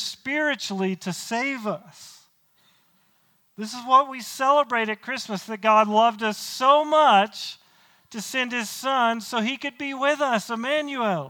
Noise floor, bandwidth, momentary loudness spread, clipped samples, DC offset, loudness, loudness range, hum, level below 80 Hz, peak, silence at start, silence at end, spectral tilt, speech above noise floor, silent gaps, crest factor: -64 dBFS; 19 kHz; 14 LU; under 0.1%; under 0.1%; -23 LUFS; 8 LU; none; -78 dBFS; -4 dBFS; 0 s; 0 s; -3.5 dB/octave; 41 dB; none; 18 dB